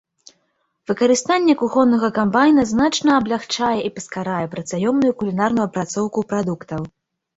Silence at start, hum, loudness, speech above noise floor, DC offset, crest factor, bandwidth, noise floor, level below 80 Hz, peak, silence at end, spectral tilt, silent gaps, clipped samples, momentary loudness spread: 0.9 s; none; -19 LUFS; 50 dB; under 0.1%; 16 dB; 8.2 kHz; -69 dBFS; -54 dBFS; -2 dBFS; 0.5 s; -5 dB/octave; none; under 0.1%; 11 LU